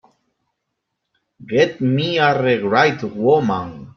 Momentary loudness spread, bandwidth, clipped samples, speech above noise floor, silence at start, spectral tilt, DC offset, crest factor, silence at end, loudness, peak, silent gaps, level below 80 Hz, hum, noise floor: 6 LU; 6.8 kHz; under 0.1%; 60 dB; 1.4 s; -6.5 dB/octave; under 0.1%; 18 dB; 0.1 s; -17 LUFS; -2 dBFS; none; -58 dBFS; none; -77 dBFS